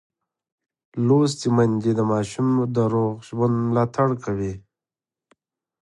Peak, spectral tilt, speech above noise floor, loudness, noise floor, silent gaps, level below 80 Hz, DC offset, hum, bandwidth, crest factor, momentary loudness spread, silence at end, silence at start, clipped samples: -6 dBFS; -7.5 dB/octave; over 69 dB; -22 LUFS; under -90 dBFS; none; -54 dBFS; under 0.1%; none; 11.5 kHz; 16 dB; 8 LU; 1.25 s; 0.95 s; under 0.1%